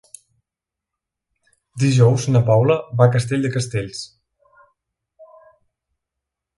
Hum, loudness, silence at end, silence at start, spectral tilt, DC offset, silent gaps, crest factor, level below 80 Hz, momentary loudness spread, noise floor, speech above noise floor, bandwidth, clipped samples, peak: none; -17 LUFS; 1.35 s; 1.75 s; -6.5 dB/octave; under 0.1%; none; 20 dB; -54 dBFS; 16 LU; -86 dBFS; 70 dB; 11.5 kHz; under 0.1%; -2 dBFS